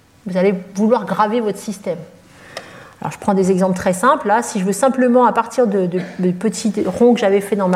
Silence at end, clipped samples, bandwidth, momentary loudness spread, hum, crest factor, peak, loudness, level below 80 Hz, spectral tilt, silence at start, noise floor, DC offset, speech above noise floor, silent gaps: 0 s; under 0.1%; 15 kHz; 13 LU; none; 14 dB; -2 dBFS; -16 LUFS; -56 dBFS; -6 dB/octave; 0.25 s; -36 dBFS; under 0.1%; 20 dB; none